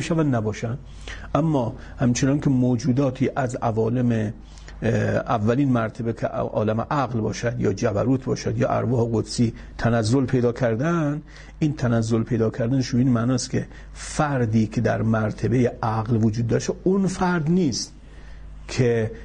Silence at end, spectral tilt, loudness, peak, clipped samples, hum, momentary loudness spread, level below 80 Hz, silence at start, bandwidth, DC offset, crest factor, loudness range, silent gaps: 0 s; -6.5 dB/octave; -23 LUFS; -6 dBFS; under 0.1%; none; 7 LU; -42 dBFS; 0 s; 9.8 kHz; under 0.1%; 16 dB; 1 LU; none